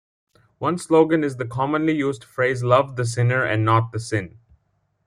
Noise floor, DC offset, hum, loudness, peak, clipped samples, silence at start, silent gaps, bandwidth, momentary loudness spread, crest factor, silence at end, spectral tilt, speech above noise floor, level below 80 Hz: -69 dBFS; under 0.1%; none; -21 LUFS; -4 dBFS; under 0.1%; 0.6 s; none; 11.5 kHz; 9 LU; 18 dB; 0.8 s; -6.5 dB/octave; 48 dB; -58 dBFS